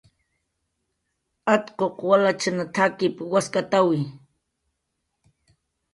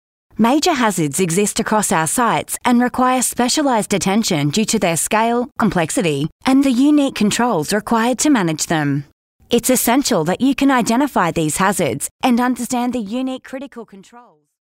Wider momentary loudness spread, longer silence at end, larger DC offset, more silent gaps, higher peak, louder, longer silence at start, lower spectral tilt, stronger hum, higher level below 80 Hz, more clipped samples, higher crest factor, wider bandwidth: about the same, 8 LU vs 6 LU; first, 1.75 s vs 0.6 s; neither; second, none vs 6.32-6.39 s, 9.12-9.39 s, 12.11-12.19 s; about the same, -4 dBFS vs -2 dBFS; second, -22 LUFS vs -16 LUFS; first, 1.45 s vs 0.4 s; about the same, -5 dB/octave vs -4 dB/octave; neither; second, -68 dBFS vs -48 dBFS; neither; first, 20 dB vs 14 dB; second, 11.5 kHz vs 16.5 kHz